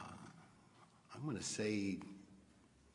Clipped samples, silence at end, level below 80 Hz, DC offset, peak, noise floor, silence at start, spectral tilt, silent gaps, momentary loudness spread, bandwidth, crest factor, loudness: under 0.1%; 0.25 s; -78 dBFS; under 0.1%; -26 dBFS; -68 dBFS; 0 s; -4.5 dB/octave; none; 25 LU; 11 kHz; 20 dB; -43 LUFS